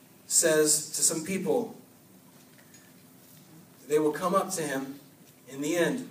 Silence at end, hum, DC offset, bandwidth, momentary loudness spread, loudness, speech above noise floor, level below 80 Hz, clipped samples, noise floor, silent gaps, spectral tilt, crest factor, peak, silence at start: 0 s; none; under 0.1%; 15.5 kHz; 15 LU; -26 LUFS; 28 dB; -78 dBFS; under 0.1%; -55 dBFS; none; -2.5 dB/octave; 22 dB; -8 dBFS; 0.3 s